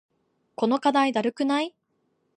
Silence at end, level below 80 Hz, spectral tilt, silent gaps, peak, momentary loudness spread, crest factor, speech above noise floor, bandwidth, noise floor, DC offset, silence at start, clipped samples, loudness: 0.65 s; -80 dBFS; -4.5 dB/octave; none; -8 dBFS; 10 LU; 18 dB; 49 dB; 10 kHz; -72 dBFS; under 0.1%; 0.6 s; under 0.1%; -24 LUFS